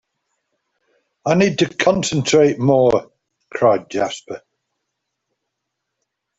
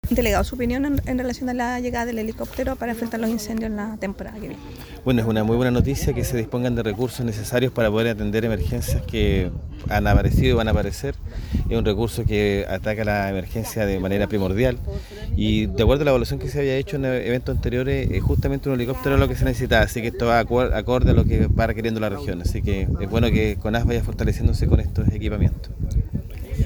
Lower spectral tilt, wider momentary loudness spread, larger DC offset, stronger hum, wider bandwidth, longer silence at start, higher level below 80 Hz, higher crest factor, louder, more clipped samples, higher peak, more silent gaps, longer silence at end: second, -5 dB/octave vs -6.5 dB/octave; first, 16 LU vs 9 LU; neither; neither; second, 8.2 kHz vs over 20 kHz; first, 1.25 s vs 0.05 s; second, -56 dBFS vs -28 dBFS; about the same, 18 dB vs 20 dB; first, -17 LUFS vs -22 LUFS; neither; about the same, -2 dBFS vs 0 dBFS; neither; first, 2 s vs 0 s